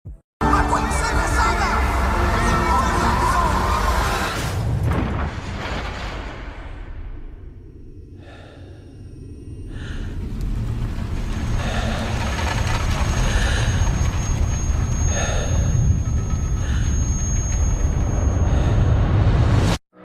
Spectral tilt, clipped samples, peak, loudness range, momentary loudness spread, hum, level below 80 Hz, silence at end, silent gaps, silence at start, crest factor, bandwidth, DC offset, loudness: -5 dB/octave; under 0.1%; -4 dBFS; 15 LU; 20 LU; none; -24 dBFS; 0 s; 0.24-0.40 s; 0.05 s; 16 dB; 15 kHz; under 0.1%; -21 LUFS